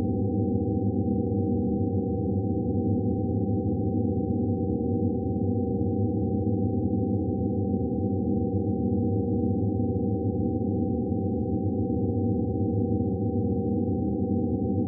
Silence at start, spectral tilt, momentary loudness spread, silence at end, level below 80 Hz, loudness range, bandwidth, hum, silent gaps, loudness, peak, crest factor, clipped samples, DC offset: 0 s; -18 dB/octave; 1 LU; 0 s; -46 dBFS; 0 LU; 0.9 kHz; none; none; -27 LUFS; -14 dBFS; 12 dB; under 0.1%; under 0.1%